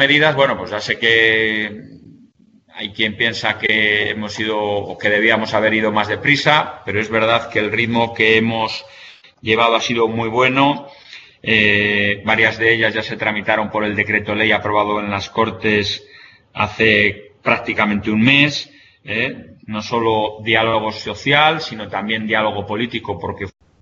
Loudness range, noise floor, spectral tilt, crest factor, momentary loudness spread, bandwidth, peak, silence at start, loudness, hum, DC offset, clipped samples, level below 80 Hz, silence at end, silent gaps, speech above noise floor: 3 LU; -51 dBFS; -5 dB/octave; 18 dB; 12 LU; 8 kHz; 0 dBFS; 0 s; -16 LUFS; none; under 0.1%; under 0.1%; -52 dBFS; 0.3 s; none; 34 dB